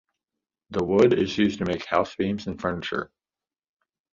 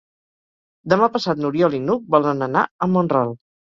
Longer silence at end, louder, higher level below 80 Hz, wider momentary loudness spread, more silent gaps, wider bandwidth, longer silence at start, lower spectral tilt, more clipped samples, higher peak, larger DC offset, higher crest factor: first, 1.1 s vs 0.4 s; second, -25 LUFS vs -19 LUFS; first, -52 dBFS vs -60 dBFS; first, 12 LU vs 6 LU; second, none vs 2.71-2.79 s; about the same, 7.6 kHz vs 7.4 kHz; second, 0.7 s vs 0.85 s; about the same, -6.5 dB/octave vs -7.5 dB/octave; neither; second, -6 dBFS vs -2 dBFS; neither; about the same, 20 dB vs 18 dB